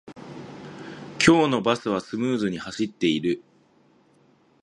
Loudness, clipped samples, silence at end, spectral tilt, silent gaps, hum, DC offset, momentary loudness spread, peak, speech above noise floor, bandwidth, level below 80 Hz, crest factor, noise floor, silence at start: -23 LUFS; under 0.1%; 1.25 s; -5 dB/octave; none; none; under 0.1%; 22 LU; -2 dBFS; 37 dB; 11.5 kHz; -58 dBFS; 24 dB; -60 dBFS; 0.05 s